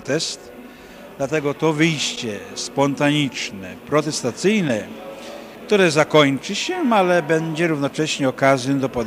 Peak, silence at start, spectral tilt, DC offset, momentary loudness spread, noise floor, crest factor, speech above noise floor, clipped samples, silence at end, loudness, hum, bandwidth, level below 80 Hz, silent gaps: 0 dBFS; 0 s; -4.5 dB/octave; under 0.1%; 18 LU; -40 dBFS; 20 dB; 21 dB; under 0.1%; 0 s; -19 LUFS; none; 15.5 kHz; -56 dBFS; none